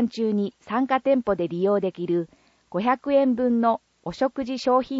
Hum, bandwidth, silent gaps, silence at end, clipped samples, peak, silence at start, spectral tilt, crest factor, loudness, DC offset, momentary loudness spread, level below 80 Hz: none; 7.8 kHz; none; 0 s; under 0.1%; -8 dBFS; 0 s; -7 dB/octave; 14 dB; -24 LUFS; under 0.1%; 6 LU; -60 dBFS